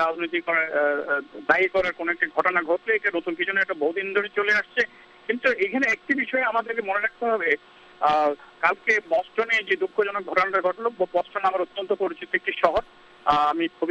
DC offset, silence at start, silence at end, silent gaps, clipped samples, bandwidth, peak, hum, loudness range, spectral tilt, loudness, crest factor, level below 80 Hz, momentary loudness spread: under 0.1%; 0 s; 0 s; none; under 0.1%; 9.2 kHz; -4 dBFS; none; 1 LU; -4.5 dB/octave; -24 LUFS; 20 dB; -58 dBFS; 5 LU